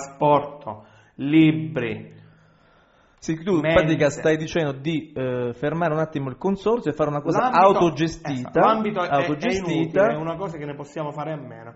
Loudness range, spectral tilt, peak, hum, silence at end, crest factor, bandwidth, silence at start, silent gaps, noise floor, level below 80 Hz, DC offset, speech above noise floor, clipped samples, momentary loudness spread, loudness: 4 LU; -5.5 dB/octave; -4 dBFS; none; 0.05 s; 20 dB; 8 kHz; 0 s; none; -57 dBFS; -50 dBFS; under 0.1%; 35 dB; under 0.1%; 14 LU; -22 LUFS